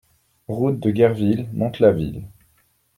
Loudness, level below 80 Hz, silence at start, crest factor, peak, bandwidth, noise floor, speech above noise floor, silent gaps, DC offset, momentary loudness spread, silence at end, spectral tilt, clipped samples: -20 LUFS; -48 dBFS; 0.5 s; 18 dB; -2 dBFS; 15.5 kHz; -62 dBFS; 43 dB; none; under 0.1%; 12 LU; 0.7 s; -9 dB/octave; under 0.1%